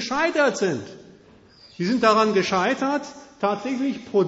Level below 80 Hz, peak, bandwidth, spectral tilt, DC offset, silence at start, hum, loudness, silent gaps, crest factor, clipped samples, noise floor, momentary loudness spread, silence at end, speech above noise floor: -60 dBFS; -4 dBFS; 8 kHz; -4.5 dB/octave; under 0.1%; 0 s; none; -22 LUFS; none; 18 dB; under 0.1%; -51 dBFS; 11 LU; 0 s; 29 dB